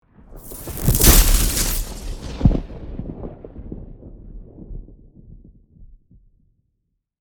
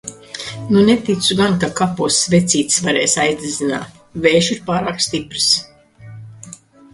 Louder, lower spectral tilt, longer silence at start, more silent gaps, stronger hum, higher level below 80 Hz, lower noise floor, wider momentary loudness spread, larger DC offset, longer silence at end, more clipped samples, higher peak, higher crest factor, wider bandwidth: about the same, -18 LUFS vs -16 LUFS; about the same, -3.5 dB/octave vs -3.5 dB/octave; first, 0.3 s vs 0.05 s; neither; neither; first, -24 dBFS vs -50 dBFS; first, -73 dBFS vs -39 dBFS; first, 29 LU vs 15 LU; neither; first, 1.35 s vs 0.4 s; neither; about the same, 0 dBFS vs 0 dBFS; about the same, 22 dB vs 18 dB; first, over 20 kHz vs 11.5 kHz